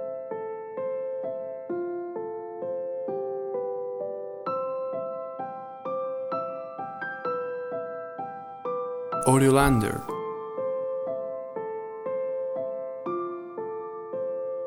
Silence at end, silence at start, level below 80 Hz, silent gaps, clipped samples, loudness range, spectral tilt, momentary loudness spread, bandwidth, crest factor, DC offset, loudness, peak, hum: 0 s; 0 s; -50 dBFS; none; under 0.1%; 7 LU; -6 dB/octave; 10 LU; 16 kHz; 24 dB; under 0.1%; -30 LUFS; -6 dBFS; none